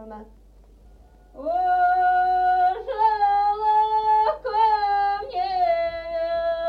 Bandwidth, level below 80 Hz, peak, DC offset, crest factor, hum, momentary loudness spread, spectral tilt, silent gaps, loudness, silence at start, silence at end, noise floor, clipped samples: 5.2 kHz; -50 dBFS; -10 dBFS; under 0.1%; 12 dB; none; 7 LU; -5 dB/octave; none; -21 LUFS; 0 s; 0 s; -50 dBFS; under 0.1%